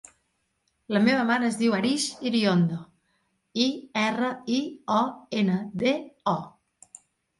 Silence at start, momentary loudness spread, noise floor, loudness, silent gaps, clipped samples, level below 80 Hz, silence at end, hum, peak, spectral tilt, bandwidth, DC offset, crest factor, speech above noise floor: 0.9 s; 7 LU; -74 dBFS; -26 LUFS; none; under 0.1%; -68 dBFS; 0.9 s; none; -8 dBFS; -5 dB/octave; 11.5 kHz; under 0.1%; 18 dB; 49 dB